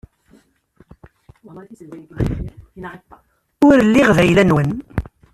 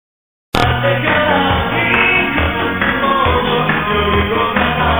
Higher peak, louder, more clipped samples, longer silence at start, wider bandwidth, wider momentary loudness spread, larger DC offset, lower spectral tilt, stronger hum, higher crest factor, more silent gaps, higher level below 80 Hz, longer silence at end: about the same, -2 dBFS vs 0 dBFS; about the same, -15 LUFS vs -14 LUFS; neither; first, 1.55 s vs 0.55 s; second, 13.5 kHz vs over 20 kHz; first, 24 LU vs 4 LU; neither; about the same, -7 dB/octave vs -6 dB/octave; neither; about the same, 16 dB vs 14 dB; neither; second, -36 dBFS vs -28 dBFS; first, 0.3 s vs 0 s